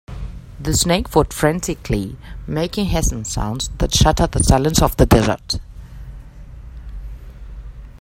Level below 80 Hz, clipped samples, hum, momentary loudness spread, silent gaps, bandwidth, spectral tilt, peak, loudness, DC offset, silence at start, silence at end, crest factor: -26 dBFS; under 0.1%; none; 23 LU; none; 16.5 kHz; -4.5 dB/octave; 0 dBFS; -18 LUFS; under 0.1%; 0.1 s; 0.05 s; 18 dB